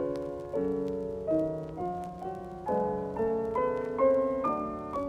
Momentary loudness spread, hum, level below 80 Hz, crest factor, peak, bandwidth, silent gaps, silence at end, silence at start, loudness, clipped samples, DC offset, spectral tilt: 10 LU; none; -54 dBFS; 16 dB; -14 dBFS; 9.8 kHz; none; 0 s; 0 s; -31 LUFS; under 0.1%; under 0.1%; -8.5 dB/octave